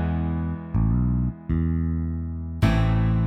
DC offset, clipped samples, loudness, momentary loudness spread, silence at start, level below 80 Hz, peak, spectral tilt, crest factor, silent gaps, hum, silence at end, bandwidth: under 0.1%; under 0.1%; -25 LUFS; 7 LU; 0 s; -30 dBFS; -8 dBFS; -9 dB/octave; 16 dB; none; none; 0 s; 9.4 kHz